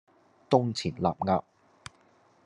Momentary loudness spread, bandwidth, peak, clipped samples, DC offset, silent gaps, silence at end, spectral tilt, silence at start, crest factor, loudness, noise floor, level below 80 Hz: 23 LU; 11 kHz; -6 dBFS; under 0.1%; under 0.1%; none; 1.05 s; -6.5 dB/octave; 0.5 s; 24 dB; -28 LUFS; -63 dBFS; -66 dBFS